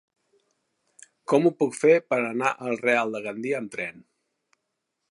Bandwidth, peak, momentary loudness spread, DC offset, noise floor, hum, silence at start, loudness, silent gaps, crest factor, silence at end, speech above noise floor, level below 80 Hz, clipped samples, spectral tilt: 11.5 kHz; -6 dBFS; 12 LU; under 0.1%; -80 dBFS; none; 1.3 s; -24 LUFS; none; 20 dB; 1.1 s; 56 dB; -78 dBFS; under 0.1%; -5.5 dB/octave